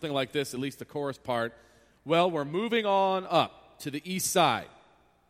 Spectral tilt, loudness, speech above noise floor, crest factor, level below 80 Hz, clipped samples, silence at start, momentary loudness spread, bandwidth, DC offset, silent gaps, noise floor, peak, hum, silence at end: -4 dB/octave; -29 LUFS; 34 dB; 20 dB; -68 dBFS; under 0.1%; 0 s; 11 LU; 16 kHz; under 0.1%; none; -62 dBFS; -10 dBFS; none; 0.6 s